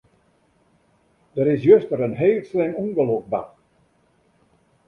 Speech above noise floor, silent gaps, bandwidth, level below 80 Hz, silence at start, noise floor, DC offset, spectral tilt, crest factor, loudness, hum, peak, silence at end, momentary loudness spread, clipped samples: 43 dB; none; 4.1 kHz; -62 dBFS; 1.35 s; -62 dBFS; under 0.1%; -10 dB/octave; 20 dB; -20 LUFS; none; -2 dBFS; 1.4 s; 13 LU; under 0.1%